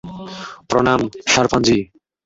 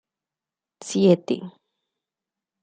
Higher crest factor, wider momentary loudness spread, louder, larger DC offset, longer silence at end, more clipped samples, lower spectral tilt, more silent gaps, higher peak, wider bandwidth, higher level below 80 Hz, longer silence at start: about the same, 18 dB vs 22 dB; second, 17 LU vs 22 LU; first, -16 LUFS vs -22 LUFS; neither; second, 0.4 s vs 1.15 s; neither; second, -4 dB/octave vs -6.5 dB/octave; neither; about the same, -2 dBFS vs -4 dBFS; second, 8 kHz vs 9.4 kHz; first, -44 dBFS vs -72 dBFS; second, 0.05 s vs 0.8 s